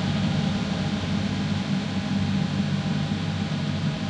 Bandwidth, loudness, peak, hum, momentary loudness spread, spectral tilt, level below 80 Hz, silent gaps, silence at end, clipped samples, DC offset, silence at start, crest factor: 9.8 kHz; -26 LUFS; -12 dBFS; none; 2 LU; -6.5 dB/octave; -48 dBFS; none; 0 s; under 0.1%; under 0.1%; 0 s; 12 dB